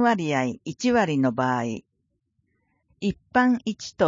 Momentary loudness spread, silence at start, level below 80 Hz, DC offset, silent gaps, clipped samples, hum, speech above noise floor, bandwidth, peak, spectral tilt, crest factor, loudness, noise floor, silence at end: 10 LU; 0 s; -58 dBFS; under 0.1%; none; under 0.1%; none; 52 dB; 7.6 kHz; -8 dBFS; -5.5 dB/octave; 18 dB; -24 LUFS; -75 dBFS; 0 s